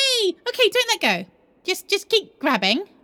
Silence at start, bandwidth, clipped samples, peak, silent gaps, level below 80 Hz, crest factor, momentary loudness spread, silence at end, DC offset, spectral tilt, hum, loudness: 0 s; over 20 kHz; under 0.1%; -2 dBFS; none; -74 dBFS; 20 dB; 8 LU; 0.2 s; under 0.1%; -2 dB/octave; none; -20 LUFS